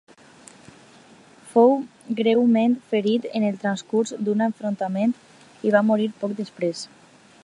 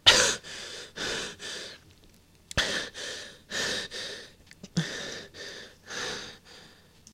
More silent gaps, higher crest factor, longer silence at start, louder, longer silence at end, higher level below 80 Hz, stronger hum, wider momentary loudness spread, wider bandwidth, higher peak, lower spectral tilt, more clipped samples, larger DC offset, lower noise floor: neither; second, 20 dB vs 30 dB; first, 1.45 s vs 0.05 s; first, -22 LUFS vs -31 LUFS; first, 0.55 s vs 0.4 s; second, -74 dBFS vs -54 dBFS; neither; second, 11 LU vs 17 LU; second, 11 kHz vs 16 kHz; about the same, -4 dBFS vs -2 dBFS; first, -6 dB/octave vs -1.5 dB/octave; neither; neither; second, -50 dBFS vs -58 dBFS